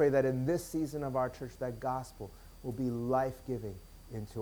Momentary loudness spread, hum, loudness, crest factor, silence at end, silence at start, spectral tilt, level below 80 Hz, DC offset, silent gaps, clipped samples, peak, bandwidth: 15 LU; none; -35 LUFS; 16 dB; 0 s; 0 s; -7 dB/octave; -54 dBFS; under 0.1%; none; under 0.1%; -18 dBFS; over 20 kHz